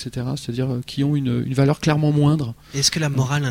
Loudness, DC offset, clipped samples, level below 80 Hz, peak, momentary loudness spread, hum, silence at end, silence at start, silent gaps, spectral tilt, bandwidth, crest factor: -20 LUFS; under 0.1%; under 0.1%; -48 dBFS; -4 dBFS; 8 LU; none; 0 s; 0 s; none; -5.5 dB/octave; 16 kHz; 16 dB